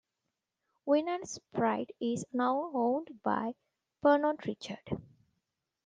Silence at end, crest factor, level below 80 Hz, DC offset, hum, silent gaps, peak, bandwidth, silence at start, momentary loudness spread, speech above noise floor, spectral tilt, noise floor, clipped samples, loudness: 0.85 s; 20 dB; -72 dBFS; under 0.1%; none; none; -14 dBFS; 9.6 kHz; 0.85 s; 13 LU; 55 dB; -5.5 dB/octave; -87 dBFS; under 0.1%; -33 LUFS